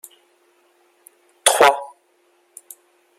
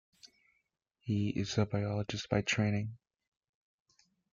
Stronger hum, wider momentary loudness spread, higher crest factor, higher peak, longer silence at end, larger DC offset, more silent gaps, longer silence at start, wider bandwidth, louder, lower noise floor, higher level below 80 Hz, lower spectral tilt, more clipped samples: neither; first, 28 LU vs 6 LU; about the same, 24 dB vs 20 dB; first, 0 dBFS vs -16 dBFS; about the same, 1.35 s vs 1.35 s; neither; neither; first, 1.45 s vs 0.25 s; first, 16.5 kHz vs 7.4 kHz; first, -16 LUFS vs -34 LUFS; second, -61 dBFS vs -81 dBFS; about the same, -68 dBFS vs -64 dBFS; second, 0.5 dB/octave vs -5.5 dB/octave; neither